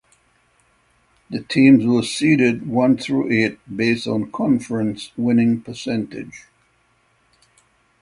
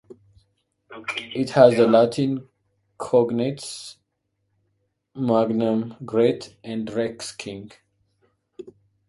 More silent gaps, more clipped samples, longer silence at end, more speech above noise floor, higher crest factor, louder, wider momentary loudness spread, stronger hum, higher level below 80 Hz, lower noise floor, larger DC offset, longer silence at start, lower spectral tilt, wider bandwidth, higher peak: neither; neither; first, 1.6 s vs 0.4 s; second, 43 dB vs 54 dB; second, 18 dB vs 24 dB; first, -18 LUFS vs -22 LUFS; second, 11 LU vs 19 LU; neither; first, -58 dBFS vs -64 dBFS; second, -61 dBFS vs -75 dBFS; neither; first, 1.3 s vs 0.1 s; about the same, -6 dB/octave vs -6 dB/octave; about the same, 11.5 kHz vs 11.5 kHz; about the same, -2 dBFS vs 0 dBFS